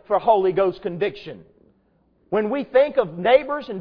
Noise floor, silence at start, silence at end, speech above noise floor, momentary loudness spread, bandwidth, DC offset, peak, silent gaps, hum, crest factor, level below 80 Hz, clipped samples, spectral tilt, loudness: -62 dBFS; 0.1 s; 0 s; 42 dB; 9 LU; 5.4 kHz; under 0.1%; -4 dBFS; none; none; 18 dB; -56 dBFS; under 0.1%; -8.5 dB/octave; -21 LUFS